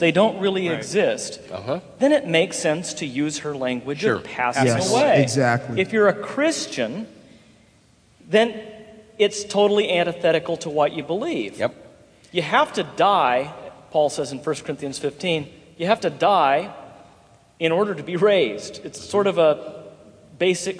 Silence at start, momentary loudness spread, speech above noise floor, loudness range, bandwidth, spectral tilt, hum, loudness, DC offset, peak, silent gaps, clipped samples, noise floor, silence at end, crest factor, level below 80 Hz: 0 s; 11 LU; 35 dB; 3 LU; 11 kHz; -4.5 dB/octave; none; -21 LUFS; under 0.1%; -2 dBFS; none; under 0.1%; -56 dBFS; 0 s; 20 dB; -62 dBFS